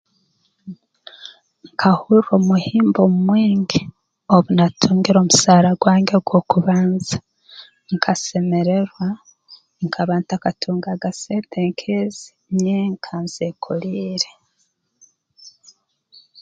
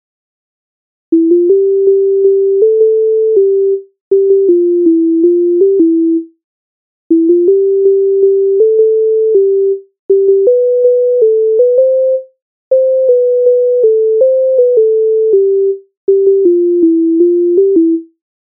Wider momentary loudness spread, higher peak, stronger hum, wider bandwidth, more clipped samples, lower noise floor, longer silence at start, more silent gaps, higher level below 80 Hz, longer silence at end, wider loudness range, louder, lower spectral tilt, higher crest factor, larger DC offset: first, 14 LU vs 5 LU; about the same, 0 dBFS vs 0 dBFS; neither; first, 9.2 kHz vs 0.8 kHz; neither; second, -67 dBFS vs under -90 dBFS; second, 0.65 s vs 1.1 s; second, none vs 4.01-4.11 s, 6.44-7.10 s, 9.99-10.09 s, 12.42-12.71 s, 15.97-16.07 s; first, -56 dBFS vs -70 dBFS; first, 0.9 s vs 0.4 s; first, 9 LU vs 1 LU; second, -18 LUFS vs -10 LUFS; second, -5.5 dB/octave vs -14 dB/octave; first, 18 dB vs 8 dB; neither